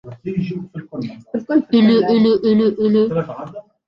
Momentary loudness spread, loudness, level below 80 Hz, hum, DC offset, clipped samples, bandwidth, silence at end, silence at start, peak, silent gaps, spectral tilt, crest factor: 16 LU; -16 LUFS; -56 dBFS; none; under 0.1%; under 0.1%; 5.8 kHz; 0.25 s; 0.05 s; -4 dBFS; none; -9 dB/octave; 14 dB